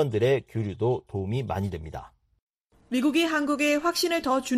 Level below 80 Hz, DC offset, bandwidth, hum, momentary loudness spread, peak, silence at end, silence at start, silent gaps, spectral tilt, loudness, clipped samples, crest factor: -54 dBFS; under 0.1%; 15.5 kHz; none; 9 LU; -12 dBFS; 0 s; 0 s; 2.41-2.54 s, 2.61-2.65 s; -5 dB/octave; -26 LUFS; under 0.1%; 16 dB